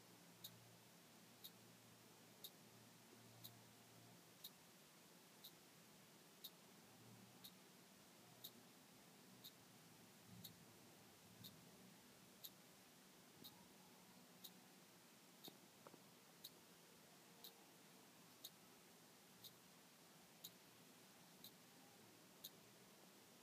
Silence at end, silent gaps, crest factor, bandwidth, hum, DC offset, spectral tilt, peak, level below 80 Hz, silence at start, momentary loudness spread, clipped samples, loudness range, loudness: 0 s; none; 28 dB; 15.5 kHz; none; under 0.1%; -2.5 dB/octave; -38 dBFS; under -90 dBFS; 0 s; 6 LU; under 0.1%; 1 LU; -64 LUFS